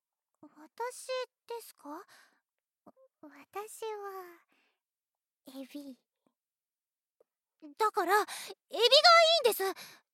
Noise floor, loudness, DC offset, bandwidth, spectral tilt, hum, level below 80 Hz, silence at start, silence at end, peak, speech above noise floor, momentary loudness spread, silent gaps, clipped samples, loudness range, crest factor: under -90 dBFS; -26 LUFS; under 0.1%; 16.5 kHz; 0.5 dB/octave; none; under -90 dBFS; 0.45 s; 0.25 s; -10 dBFS; over 59 dB; 26 LU; 7.10-7.15 s; under 0.1%; 25 LU; 24 dB